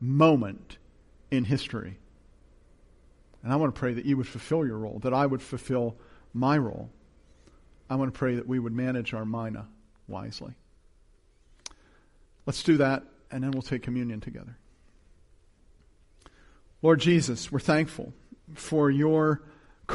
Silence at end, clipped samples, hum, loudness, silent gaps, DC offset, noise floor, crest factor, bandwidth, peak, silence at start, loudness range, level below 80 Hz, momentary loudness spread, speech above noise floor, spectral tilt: 0 s; under 0.1%; none; -28 LUFS; none; under 0.1%; -60 dBFS; 20 dB; 11.5 kHz; -8 dBFS; 0 s; 10 LU; -56 dBFS; 20 LU; 33 dB; -6.5 dB/octave